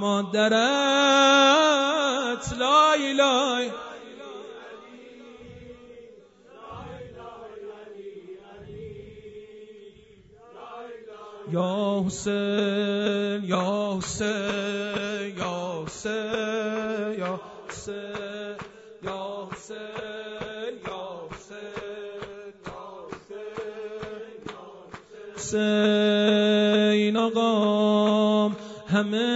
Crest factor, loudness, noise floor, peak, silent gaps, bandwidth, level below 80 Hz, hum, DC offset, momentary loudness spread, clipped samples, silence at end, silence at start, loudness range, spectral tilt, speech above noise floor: 18 dB; -24 LUFS; -53 dBFS; -8 dBFS; none; 8 kHz; -58 dBFS; none; under 0.1%; 23 LU; under 0.1%; 0 s; 0 s; 22 LU; -4 dB/octave; 30 dB